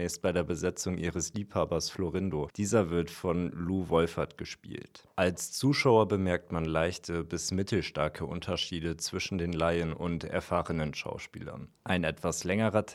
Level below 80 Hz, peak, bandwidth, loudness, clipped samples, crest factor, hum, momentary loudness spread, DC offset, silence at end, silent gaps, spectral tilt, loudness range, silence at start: -52 dBFS; -10 dBFS; 15.5 kHz; -31 LUFS; under 0.1%; 22 dB; none; 10 LU; under 0.1%; 0 s; none; -5 dB/octave; 3 LU; 0 s